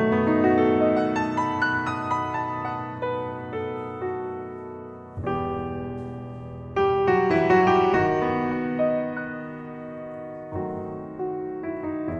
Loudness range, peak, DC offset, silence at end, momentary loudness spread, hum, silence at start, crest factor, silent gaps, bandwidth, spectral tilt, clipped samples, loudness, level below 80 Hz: 9 LU; -8 dBFS; under 0.1%; 0 s; 16 LU; none; 0 s; 18 dB; none; 8 kHz; -7.5 dB/octave; under 0.1%; -25 LUFS; -52 dBFS